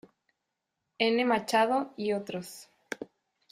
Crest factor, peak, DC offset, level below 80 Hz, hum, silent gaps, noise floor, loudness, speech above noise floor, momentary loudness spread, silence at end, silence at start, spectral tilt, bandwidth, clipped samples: 20 dB; -12 dBFS; under 0.1%; -76 dBFS; none; none; -84 dBFS; -28 LUFS; 56 dB; 19 LU; 0.5 s; 1 s; -4 dB/octave; 15.5 kHz; under 0.1%